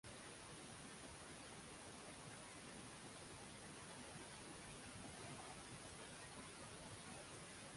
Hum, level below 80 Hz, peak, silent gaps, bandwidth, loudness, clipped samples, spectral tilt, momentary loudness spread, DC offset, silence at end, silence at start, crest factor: none; -72 dBFS; -42 dBFS; none; 11.5 kHz; -55 LUFS; under 0.1%; -3 dB/octave; 1 LU; under 0.1%; 0 s; 0.05 s; 14 dB